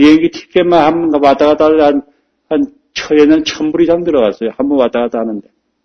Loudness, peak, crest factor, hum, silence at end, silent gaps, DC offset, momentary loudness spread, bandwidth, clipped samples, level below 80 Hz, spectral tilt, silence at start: -12 LUFS; 0 dBFS; 12 dB; none; 0.45 s; none; under 0.1%; 10 LU; 6.6 kHz; 0.4%; -44 dBFS; -5.5 dB/octave; 0 s